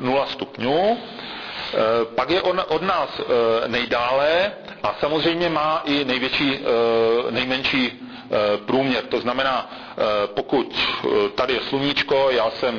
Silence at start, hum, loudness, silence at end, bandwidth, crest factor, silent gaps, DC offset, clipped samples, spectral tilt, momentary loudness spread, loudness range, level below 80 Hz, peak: 0 s; none; -21 LUFS; 0 s; 5.4 kHz; 12 dB; none; under 0.1%; under 0.1%; -5.5 dB/octave; 7 LU; 2 LU; -52 dBFS; -10 dBFS